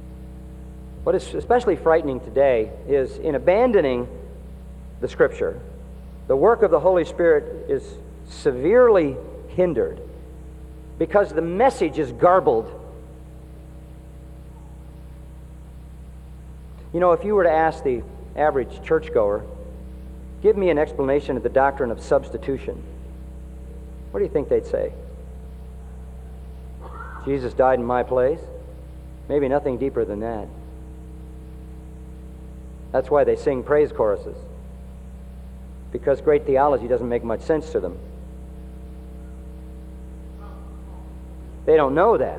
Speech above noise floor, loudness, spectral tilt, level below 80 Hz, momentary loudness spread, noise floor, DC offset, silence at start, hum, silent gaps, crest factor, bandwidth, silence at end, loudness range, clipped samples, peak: 20 dB; -21 LUFS; -7.5 dB/octave; -38 dBFS; 23 LU; -40 dBFS; under 0.1%; 0 s; none; none; 18 dB; 11 kHz; 0 s; 9 LU; under 0.1%; -4 dBFS